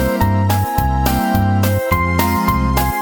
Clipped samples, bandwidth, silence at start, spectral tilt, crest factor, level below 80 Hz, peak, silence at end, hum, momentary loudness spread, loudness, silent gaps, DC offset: under 0.1%; over 20 kHz; 0 s; -6 dB/octave; 16 dB; -24 dBFS; 0 dBFS; 0 s; none; 1 LU; -16 LUFS; none; under 0.1%